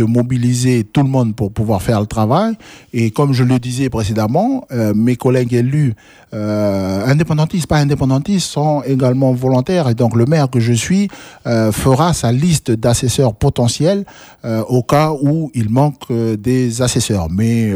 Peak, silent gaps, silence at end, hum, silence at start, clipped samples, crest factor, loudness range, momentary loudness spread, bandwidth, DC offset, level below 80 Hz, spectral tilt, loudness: 0 dBFS; none; 0 s; none; 0 s; under 0.1%; 14 dB; 2 LU; 6 LU; 15.5 kHz; under 0.1%; -38 dBFS; -6.5 dB/octave; -15 LUFS